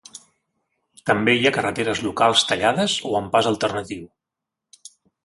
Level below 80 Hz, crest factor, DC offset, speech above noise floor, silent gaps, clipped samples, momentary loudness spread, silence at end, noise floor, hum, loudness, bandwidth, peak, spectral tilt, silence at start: -56 dBFS; 20 dB; under 0.1%; 65 dB; none; under 0.1%; 12 LU; 1.2 s; -85 dBFS; none; -20 LUFS; 11.5 kHz; -2 dBFS; -3.5 dB/octave; 1.05 s